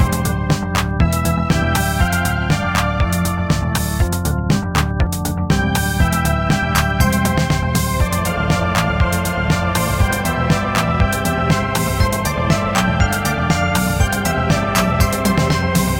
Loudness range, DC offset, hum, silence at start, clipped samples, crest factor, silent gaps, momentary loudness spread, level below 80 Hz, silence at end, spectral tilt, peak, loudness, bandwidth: 1 LU; under 0.1%; none; 0 s; under 0.1%; 16 dB; none; 3 LU; -24 dBFS; 0 s; -5 dB/octave; 0 dBFS; -17 LUFS; 17 kHz